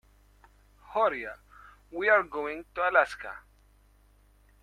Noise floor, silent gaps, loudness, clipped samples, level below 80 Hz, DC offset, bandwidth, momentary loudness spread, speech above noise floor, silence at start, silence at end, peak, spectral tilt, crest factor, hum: -61 dBFS; none; -27 LUFS; under 0.1%; -60 dBFS; under 0.1%; 13 kHz; 18 LU; 33 dB; 0.9 s; 1.25 s; -8 dBFS; -4 dB/octave; 22 dB; 50 Hz at -60 dBFS